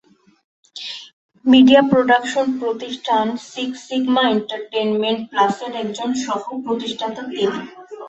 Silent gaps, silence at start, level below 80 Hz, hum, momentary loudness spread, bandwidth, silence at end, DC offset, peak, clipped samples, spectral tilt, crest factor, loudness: 1.13-1.29 s; 0.75 s; -60 dBFS; none; 17 LU; 8.2 kHz; 0 s; under 0.1%; -2 dBFS; under 0.1%; -4.5 dB/octave; 18 dB; -18 LUFS